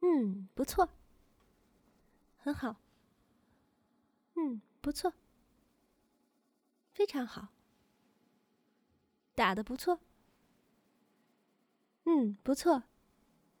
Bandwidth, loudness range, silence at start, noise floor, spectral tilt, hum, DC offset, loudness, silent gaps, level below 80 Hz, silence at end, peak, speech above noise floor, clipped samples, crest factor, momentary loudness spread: over 20 kHz; 7 LU; 0 s; -78 dBFS; -5 dB/octave; none; under 0.1%; -35 LUFS; none; -62 dBFS; 0.8 s; -16 dBFS; 45 dB; under 0.1%; 22 dB; 12 LU